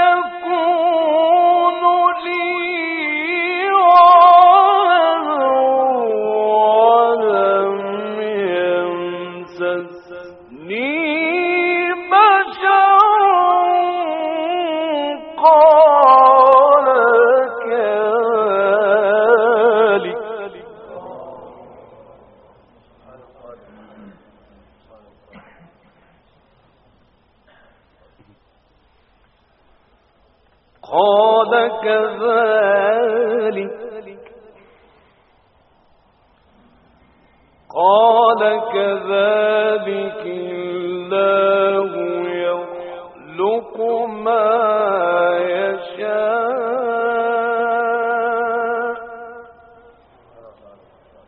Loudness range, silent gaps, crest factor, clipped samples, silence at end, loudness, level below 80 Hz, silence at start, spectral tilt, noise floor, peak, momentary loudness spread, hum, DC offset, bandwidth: 10 LU; none; 16 dB; under 0.1%; 1.85 s; -15 LUFS; -62 dBFS; 0 s; -1.5 dB/octave; -57 dBFS; 0 dBFS; 16 LU; none; under 0.1%; 5.2 kHz